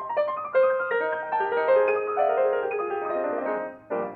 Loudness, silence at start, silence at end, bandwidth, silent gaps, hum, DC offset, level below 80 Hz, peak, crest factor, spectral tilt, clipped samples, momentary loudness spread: -25 LUFS; 0 s; 0 s; 4.5 kHz; none; none; under 0.1%; -72 dBFS; -12 dBFS; 14 dB; -7.5 dB/octave; under 0.1%; 7 LU